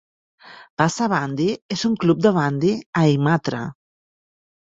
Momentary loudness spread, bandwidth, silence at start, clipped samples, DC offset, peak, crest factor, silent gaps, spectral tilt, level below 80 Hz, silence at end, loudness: 9 LU; 7.8 kHz; 0.45 s; under 0.1%; under 0.1%; 0 dBFS; 20 dB; 0.70-0.77 s, 1.62-1.69 s, 2.86-2.93 s; -6 dB/octave; -58 dBFS; 0.95 s; -20 LUFS